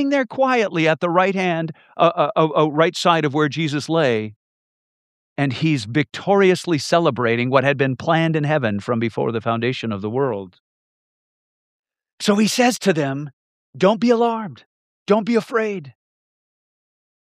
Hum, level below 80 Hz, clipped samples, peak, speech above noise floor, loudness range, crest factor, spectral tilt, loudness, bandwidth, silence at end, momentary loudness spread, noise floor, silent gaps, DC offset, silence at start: none; -68 dBFS; under 0.1%; -2 dBFS; over 71 dB; 5 LU; 18 dB; -5.5 dB/octave; -19 LUFS; 15 kHz; 1.45 s; 8 LU; under -90 dBFS; 4.36-5.36 s, 10.60-11.83 s, 12.13-12.18 s, 13.33-13.73 s, 14.66-15.06 s; under 0.1%; 0 s